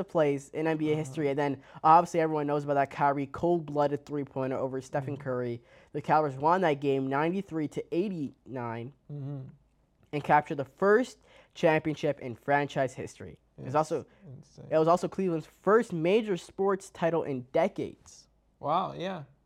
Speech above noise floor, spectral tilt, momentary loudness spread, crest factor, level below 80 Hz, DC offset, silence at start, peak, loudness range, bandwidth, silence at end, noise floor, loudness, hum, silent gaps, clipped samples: 37 dB; -6.5 dB/octave; 13 LU; 22 dB; -66 dBFS; under 0.1%; 0 s; -8 dBFS; 5 LU; 13 kHz; 0.2 s; -66 dBFS; -29 LUFS; none; none; under 0.1%